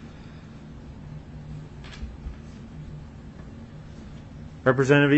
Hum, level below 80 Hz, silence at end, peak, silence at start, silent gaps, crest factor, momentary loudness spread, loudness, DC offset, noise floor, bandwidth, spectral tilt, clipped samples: none; -46 dBFS; 0 s; -6 dBFS; 0 s; none; 22 dB; 20 LU; -27 LUFS; under 0.1%; -42 dBFS; 8.4 kHz; -7 dB/octave; under 0.1%